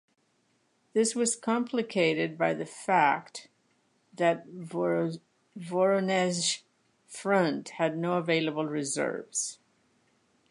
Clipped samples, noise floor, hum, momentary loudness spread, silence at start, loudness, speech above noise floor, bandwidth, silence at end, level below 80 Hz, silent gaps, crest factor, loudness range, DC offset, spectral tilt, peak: under 0.1%; -71 dBFS; none; 10 LU; 0.95 s; -29 LUFS; 43 dB; 11.5 kHz; 0.95 s; -82 dBFS; none; 20 dB; 2 LU; under 0.1%; -4 dB/octave; -10 dBFS